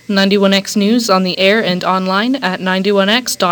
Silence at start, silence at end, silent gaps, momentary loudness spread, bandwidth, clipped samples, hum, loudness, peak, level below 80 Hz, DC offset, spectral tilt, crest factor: 0.1 s; 0 s; none; 4 LU; 19.5 kHz; under 0.1%; none; -13 LUFS; 0 dBFS; -60 dBFS; under 0.1%; -4.5 dB/octave; 14 dB